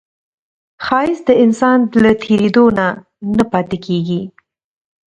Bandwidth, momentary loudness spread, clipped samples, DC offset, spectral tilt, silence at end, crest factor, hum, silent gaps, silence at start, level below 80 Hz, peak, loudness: 9 kHz; 10 LU; under 0.1%; under 0.1%; -7 dB/octave; 0.8 s; 14 dB; none; none; 0.8 s; -48 dBFS; 0 dBFS; -14 LUFS